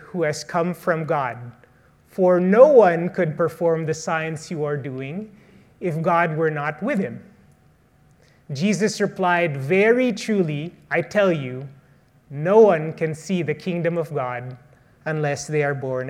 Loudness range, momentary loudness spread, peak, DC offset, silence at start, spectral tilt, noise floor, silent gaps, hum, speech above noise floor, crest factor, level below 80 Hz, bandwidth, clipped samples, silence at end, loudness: 6 LU; 17 LU; 0 dBFS; under 0.1%; 0 s; -6.5 dB/octave; -56 dBFS; none; none; 36 dB; 20 dB; -64 dBFS; 14 kHz; under 0.1%; 0 s; -21 LUFS